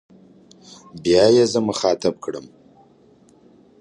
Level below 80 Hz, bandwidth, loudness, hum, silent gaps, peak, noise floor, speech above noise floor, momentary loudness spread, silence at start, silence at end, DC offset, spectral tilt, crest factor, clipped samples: -56 dBFS; 11 kHz; -18 LUFS; none; none; -2 dBFS; -53 dBFS; 34 dB; 19 LU; 0.95 s; 1.4 s; under 0.1%; -4.5 dB/octave; 18 dB; under 0.1%